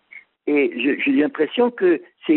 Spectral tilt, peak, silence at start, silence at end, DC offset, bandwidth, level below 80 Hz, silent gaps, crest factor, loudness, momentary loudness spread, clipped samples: -3 dB/octave; -6 dBFS; 0.15 s; 0 s; under 0.1%; 4.2 kHz; -70 dBFS; none; 14 dB; -20 LUFS; 4 LU; under 0.1%